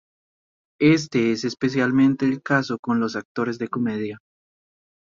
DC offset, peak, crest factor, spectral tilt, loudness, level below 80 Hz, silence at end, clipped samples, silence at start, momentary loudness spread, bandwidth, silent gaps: under 0.1%; -4 dBFS; 18 dB; -6 dB/octave; -22 LUFS; -62 dBFS; 0.9 s; under 0.1%; 0.8 s; 8 LU; 7.6 kHz; 2.79-2.83 s, 3.25-3.35 s